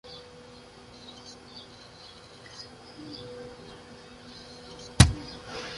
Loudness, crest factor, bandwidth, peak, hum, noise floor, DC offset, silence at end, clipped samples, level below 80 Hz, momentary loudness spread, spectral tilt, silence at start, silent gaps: -25 LUFS; 32 dB; 11.5 kHz; 0 dBFS; none; -49 dBFS; under 0.1%; 0 s; under 0.1%; -40 dBFS; 26 LU; -4 dB/octave; 0.05 s; none